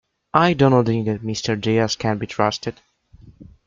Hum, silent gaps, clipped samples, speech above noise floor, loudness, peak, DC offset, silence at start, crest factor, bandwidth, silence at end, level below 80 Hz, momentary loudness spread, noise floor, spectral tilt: none; none; under 0.1%; 29 dB; -20 LUFS; 0 dBFS; under 0.1%; 0.35 s; 20 dB; 7.6 kHz; 0.25 s; -52 dBFS; 9 LU; -48 dBFS; -6 dB/octave